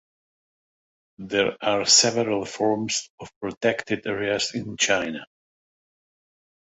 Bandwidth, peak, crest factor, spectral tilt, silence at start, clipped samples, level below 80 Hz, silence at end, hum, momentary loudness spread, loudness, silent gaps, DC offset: 8.4 kHz; -4 dBFS; 22 dB; -2 dB/octave; 1.2 s; under 0.1%; -62 dBFS; 1.5 s; none; 18 LU; -22 LUFS; 3.10-3.18 s, 3.36-3.41 s, 3.57-3.61 s; under 0.1%